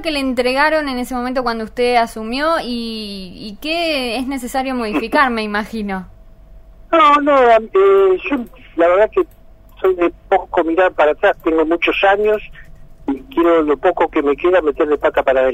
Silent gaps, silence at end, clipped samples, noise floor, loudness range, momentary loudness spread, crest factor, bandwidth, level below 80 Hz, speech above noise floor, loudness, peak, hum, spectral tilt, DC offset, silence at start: none; 0 s; under 0.1%; -40 dBFS; 6 LU; 12 LU; 16 dB; 16 kHz; -40 dBFS; 25 dB; -16 LUFS; 0 dBFS; none; -4.5 dB/octave; under 0.1%; 0 s